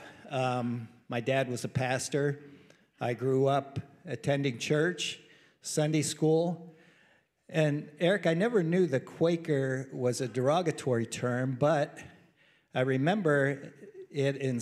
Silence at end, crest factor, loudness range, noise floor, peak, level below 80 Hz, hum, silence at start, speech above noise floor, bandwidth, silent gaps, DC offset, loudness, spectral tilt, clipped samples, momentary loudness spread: 0 s; 18 dB; 3 LU; -66 dBFS; -14 dBFS; -74 dBFS; none; 0 s; 37 dB; 14.5 kHz; none; under 0.1%; -30 LUFS; -5.5 dB/octave; under 0.1%; 11 LU